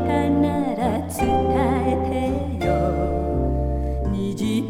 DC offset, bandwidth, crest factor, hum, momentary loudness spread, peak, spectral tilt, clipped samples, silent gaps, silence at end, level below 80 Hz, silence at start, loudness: under 0.1%; 16.5 kHz; 14 dB; none; 5 LU; -8 dBFS; -7.5 dB/octave; under 0.1%; none; 0 s; -30 dBFS; 0 s; -22 LUFS